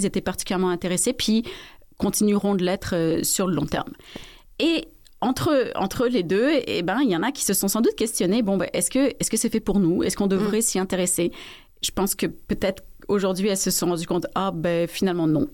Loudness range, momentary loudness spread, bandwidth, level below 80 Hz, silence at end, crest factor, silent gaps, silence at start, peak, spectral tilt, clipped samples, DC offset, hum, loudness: 3 LU; 7 LU; 17 kHz; -46 dBFS; 0 s; 12 dB; none; 0 s; -10 dBFS; -4 dB/octave; under 0.1%; under 0.1%; none; -23 LUFS